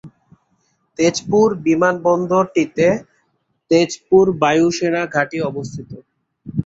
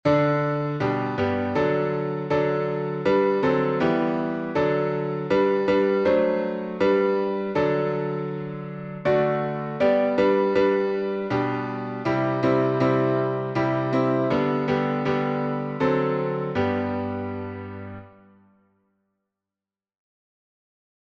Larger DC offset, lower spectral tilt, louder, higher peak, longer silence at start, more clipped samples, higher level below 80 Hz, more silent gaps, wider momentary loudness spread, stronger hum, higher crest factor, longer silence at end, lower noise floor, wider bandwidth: neither; second, -5.5 dB/octave vs -8.5 dB/octave; first, -17 LUFS vs -23 LUFS; first, -2 dBFS vs -8 dBFS; about the same, 0.05 s vs 0.05 s; neither; about the same, -54 dBFS vs -58 dBFS; neither; first, 13 LU vs 8 LU; neither; about the same, 16 dB vs 16 dB; second, 0.05 s vs 2.95 s; second, -67 dBFS vs under -90 dBFS; first, 8 kHz vs 7 kHz